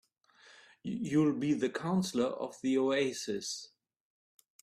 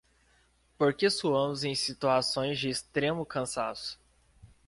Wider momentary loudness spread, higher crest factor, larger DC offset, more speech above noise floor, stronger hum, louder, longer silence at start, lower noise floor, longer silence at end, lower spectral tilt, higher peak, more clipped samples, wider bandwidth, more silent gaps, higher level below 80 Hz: first, 12 LU vs 8 LU; about the same, 16 dB vs 18 dB; neither; second, 28 dB vs 37 dB; neither; second, -33 LUFS vs -30 LUFS; second, 0.5 s vs 0.8 s; second, -60 dBFS vs -67 dBFS; first, 0.95 s vs 0.2 s; about the same, -5 dB/octave vs -4 dB/octave; second, -18 dBFS vs -12 dBFS; neither; first, 13.5 kHz vs 11.5 kHz; neither; second, -74 dBFS vs -64 dBFS